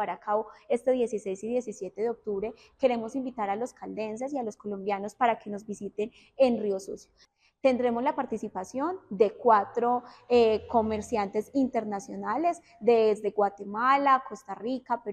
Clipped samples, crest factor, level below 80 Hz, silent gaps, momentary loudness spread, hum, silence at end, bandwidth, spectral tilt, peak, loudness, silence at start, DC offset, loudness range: under 0.1%; 18 dB; -66 dBFS; none; 12 LU; none; 0 s; 9.4 kHz; -5.5 dB/octave; -10 dBFS; -28 LUFS; 0 s; under 0.1%; 6 LU